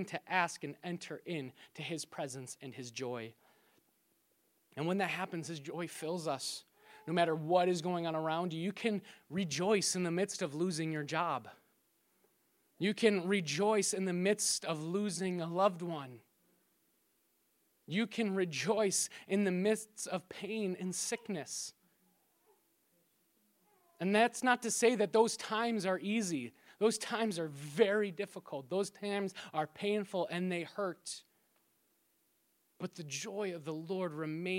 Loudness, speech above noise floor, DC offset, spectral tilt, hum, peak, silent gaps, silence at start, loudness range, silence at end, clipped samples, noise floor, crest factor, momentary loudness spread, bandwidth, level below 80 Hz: -35 LUFS; 41 dB; under 0.1%; -4 dB/octave; none; -14 dBFS; none; 0 s; 10 LU; 0 s; under 0.1%; -76 dBFS; 22 dB; 12 LU; 16.5 kHz; -86 dBFS